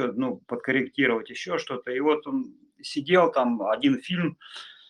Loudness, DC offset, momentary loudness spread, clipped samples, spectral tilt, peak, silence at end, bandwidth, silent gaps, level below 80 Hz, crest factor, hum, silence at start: -26 LUFS; under 0.1%; 12 LU; under 0.1%; -6 dB/octave; -6 dBFS; 0.15 s; 10.5 kHz; none; -74 dBFS; 20 dB; none; 0 s